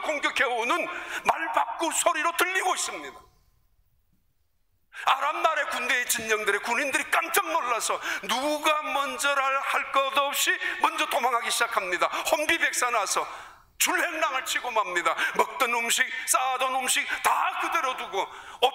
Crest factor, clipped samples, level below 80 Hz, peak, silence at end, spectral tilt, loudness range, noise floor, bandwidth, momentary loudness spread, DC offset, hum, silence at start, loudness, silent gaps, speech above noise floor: 18 dB; under 0.1%; -66 dBFS; -8 dBFS; 0 s; 0 dB/octave; 4 LU; -72 dBFS; 16 kHz; 4 LU; under 0.1%; none; 0 s; -25 LUFS; none; 46 dB